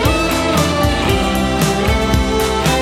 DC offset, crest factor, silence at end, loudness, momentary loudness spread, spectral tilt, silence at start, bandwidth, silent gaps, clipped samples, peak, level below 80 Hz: under 0.1%; 14 dB; 0 s; -15 LUFS; 1 LU; -4.5 dB/octave; 0 s; 17 kHz; none; under 0.1%; 0 dBFS; -22 dBFS